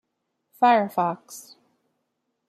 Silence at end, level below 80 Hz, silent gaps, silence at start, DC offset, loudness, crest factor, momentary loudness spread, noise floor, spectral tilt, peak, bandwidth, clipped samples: 1.1 s; -80 dBFS; none; 0.6 s; under 0.1%; -22 LUFS; 18 dB; 23 LU; -78 dBFS; -5 dB/octave; -8 dBFS; 14.5 kHz; under 0.1%